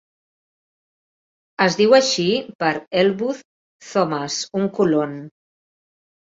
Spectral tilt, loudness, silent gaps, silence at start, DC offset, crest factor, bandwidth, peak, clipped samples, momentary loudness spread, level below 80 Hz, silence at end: -4 dB/octave; -19 LUFS; 2.55-2.59 s, 3.45-3.80 s; 1.6 s; under 0.1%; 20 dB; 7.8 kHz; -2 dBFS; under 0.1%; 13 LU; -64 dBFS; 1.1 s